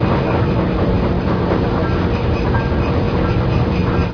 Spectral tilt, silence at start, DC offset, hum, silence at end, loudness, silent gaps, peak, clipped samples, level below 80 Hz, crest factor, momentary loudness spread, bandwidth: -9 dB/octave; 0 s; under 0.1%; none; 0 s; -17 LUFS; none; -4 dBFS; under 0.1%; -24 dBFS; 12 dB; 1 LU; 5.4 kHz